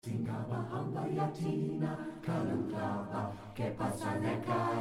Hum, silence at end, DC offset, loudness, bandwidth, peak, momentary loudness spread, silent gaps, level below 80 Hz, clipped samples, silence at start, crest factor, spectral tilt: none; 0 s; under 0.1%; -37 LUFS; 15.5 kHz; -20 dBFS; 5 LU; none; -64 dBFS; under 0.1%; 0.05 s; 14 dB; -7.5 dB/octave